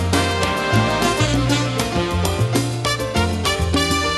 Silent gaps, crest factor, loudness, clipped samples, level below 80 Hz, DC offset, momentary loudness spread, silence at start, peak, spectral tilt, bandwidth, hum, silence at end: none; 16 dB; -19 LUFS; under 0.1%; -32 dBFS; under 0.1%; 3 LU; 0 s; -4 dBFS; -4.5 dB/octave; 13 kHz; none; 0 s